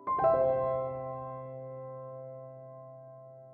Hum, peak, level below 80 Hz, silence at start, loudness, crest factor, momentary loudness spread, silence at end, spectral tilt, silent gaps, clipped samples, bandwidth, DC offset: none; -16 dBFS; -66 dBFS; 0 s; -32 LUFS; 18 dB; 23 LU; 0 s; -8 dB/octave; none; under 0.1%; 4.3 kHz; under 0.1%